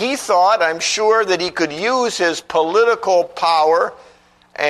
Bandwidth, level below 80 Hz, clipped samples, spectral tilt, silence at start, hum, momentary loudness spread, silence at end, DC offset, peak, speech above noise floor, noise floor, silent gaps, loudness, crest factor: 13.5 kHz; -60 dBFS; under 0.1%; -2 dB/octave; 0 s; none; 5 LU; 0 s; under 0.1%; -2 dBFS; 29 dB; -45 dBFS; none; -16 LUFS; 14 dB